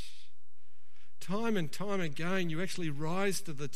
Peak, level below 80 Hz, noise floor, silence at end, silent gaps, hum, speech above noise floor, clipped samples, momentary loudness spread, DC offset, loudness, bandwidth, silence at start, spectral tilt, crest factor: -20 dBFS; -70 dBFS; -75 dBFS; 0 s; none; none; 40 dB; under 0.1%; 6 LU; 3%; -35 LUFS; 13 kHz; 0 s; -5 dB/octave; 18 dB